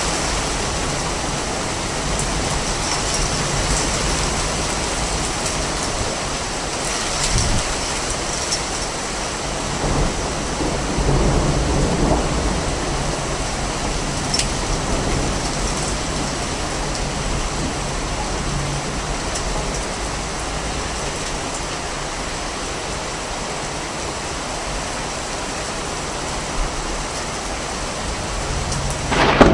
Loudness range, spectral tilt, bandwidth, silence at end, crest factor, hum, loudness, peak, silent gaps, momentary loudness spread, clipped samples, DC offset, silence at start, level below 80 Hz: 5 LU; -3.5 dB/octave; 11.5 kHz; 0 s; 22 dB; none; -22 LUFS; 0 dBFS; none; 6 LU; under 0.1%; under 0.1%; 0 s; -28 dBFS